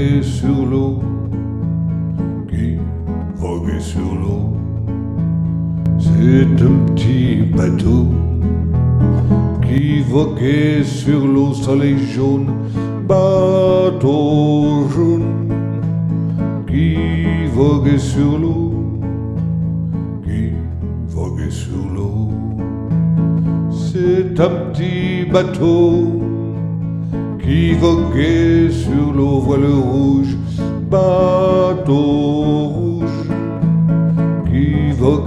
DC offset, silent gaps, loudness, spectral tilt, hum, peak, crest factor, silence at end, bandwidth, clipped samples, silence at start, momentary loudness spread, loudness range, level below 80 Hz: under 0.1%; none; -16 LUFS; -8.5 dB/octave; none; 0 dBFS; 14 dB; 0 s; 9.6 kHz; under 0.1%; 0 s; 9 LU; 6 LU; -30 dBFS